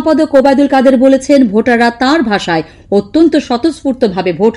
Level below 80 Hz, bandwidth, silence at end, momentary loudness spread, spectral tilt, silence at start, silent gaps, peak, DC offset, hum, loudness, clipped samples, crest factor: -42 dBFS; 11.5 kHz; 0 s; 7 LU; -5.5 dB/octave; 0 s; none; 0 dBFS; under 0.1%; none; -10 LUFS; 2%; 10 dB